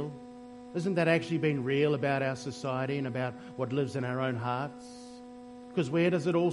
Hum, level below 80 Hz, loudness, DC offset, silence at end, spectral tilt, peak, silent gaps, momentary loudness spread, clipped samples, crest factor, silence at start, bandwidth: none; -68 dBFS; -31 LUFS; under 0.1%; 0 s; -7 dB/octave; -12 dBFS; none; 20 LU; under 0.1%; 20 dB; 0 s; 11.5 kHz